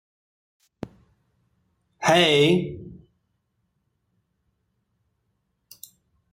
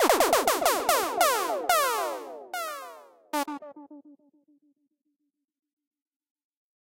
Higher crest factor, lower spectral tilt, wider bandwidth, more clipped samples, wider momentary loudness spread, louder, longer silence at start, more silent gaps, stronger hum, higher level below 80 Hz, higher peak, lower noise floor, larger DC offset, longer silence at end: about the same, 20 dB vs 20 dB; first, -4.5 dB/octave vs -0.5 dB/octave; about the same, 16 kHz vs 16 kHz; neither; first, 24 LU vs 17 LU; first, -19 LUFS vs -26 LUFS; first, 0.85 s vs 0 s; neither; neither; about the same, -62 dBFS vs -64 dBFS; about the same, -8 dBFS vs -8 dBFS; second, -74 dBFS vs -80 dBFS; neither; first, 3.4 s vs 2.75 s